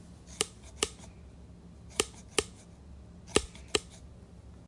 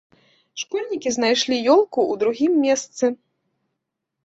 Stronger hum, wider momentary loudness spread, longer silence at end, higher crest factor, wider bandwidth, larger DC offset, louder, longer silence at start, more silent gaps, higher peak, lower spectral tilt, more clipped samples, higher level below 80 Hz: neither; first, 21 LU vs 11 LU; second, 0 s vs 1.1 s; first, 32 dB vs 16 dB; first, 11.5 kHz vs 8.2 kHz; neither; second, -34 LUFS vs -20 LUFS; second, 0 s vs 0.55 s; neither; about the same, -6 dBFS vs -6 dBFS; about the same, -2 dB/octave vs -2.5 dB/octave; neither; first, -52 dBFS vs -66 dBFS